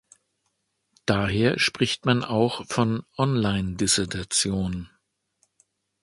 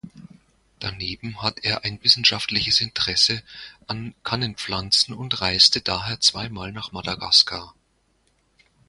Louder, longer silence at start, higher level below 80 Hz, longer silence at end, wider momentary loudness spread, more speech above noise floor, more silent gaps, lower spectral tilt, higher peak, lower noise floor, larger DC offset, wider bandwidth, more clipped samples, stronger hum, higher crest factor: second, -24 LUFS vs -20 LUFS; first, 1.05 s vs 0.05 s; about the same, -48 dBFS vs -50 dBFS; about the same, 1.15 s vs 1.2 s; second, 5 LU vs 17 LU; first, 51 dB vs 43 dB; neither; first, -4 dB/octave vs -2 dB/octave; second, -4 dBFS vs 0 dBFS; first, -75 dBFS vs -66 dBFS; neither; about the same, 11.5 kHz vs 11.5 kHz; neither; neither; about the same, 22 dB vs 24 dB